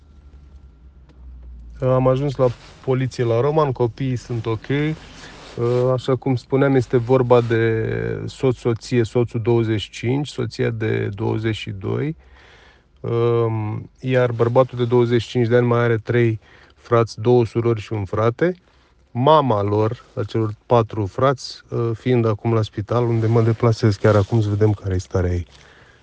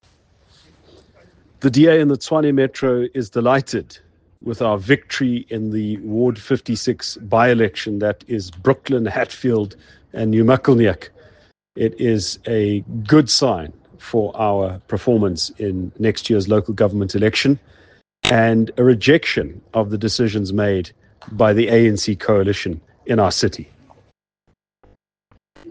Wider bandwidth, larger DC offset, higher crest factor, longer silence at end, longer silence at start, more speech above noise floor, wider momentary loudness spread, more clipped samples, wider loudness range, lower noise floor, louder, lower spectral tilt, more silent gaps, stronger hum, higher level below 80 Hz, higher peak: second, 8.6 kHz vs 9.8 kHz; neither; about the same, 18 dB vs 18 dB; first, 0.6 s vs 0 s; second, 0.25 s vs 1.6 s; second, 31 dB vs 48 dB; about the same, 9 LU vs 10 LU; neither; about the same, 4 LU vs 3 LU; second, -50 dBFS vs -66 dBFS; about the same, -20 LUFS vs -18 LUFS; first, -8 dB/octave vs -5.5 dB/octave; neither; neither; about the same, -48 dBFS vs -50 dBFS; about the same, -2 dBFS vs 0 dBFS